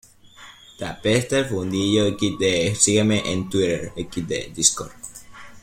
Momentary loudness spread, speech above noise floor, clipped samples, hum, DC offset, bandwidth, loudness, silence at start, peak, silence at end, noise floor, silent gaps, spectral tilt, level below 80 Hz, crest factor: 16 LU; 25 dB; under 0.1%; none; under 0.1%; 16.5 kHz; -21 LUFS; 0.4 s; 0 dBFS; 0.05 s; -46 dBFS; none; -3.5 dB/octave; -50 dBFS; 22 dB